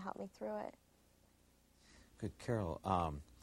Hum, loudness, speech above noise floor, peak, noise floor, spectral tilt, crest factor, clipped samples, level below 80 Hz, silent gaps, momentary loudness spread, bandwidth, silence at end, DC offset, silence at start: none; -42 LUFS; 29 dB; -20 dBFS; -71 dBFS; -7 dB/octave; 24 dB; under 0.1%; -60 dBFS; none; 11 LU; 16 kHz; 0.05 s; under 0.1%; 0 s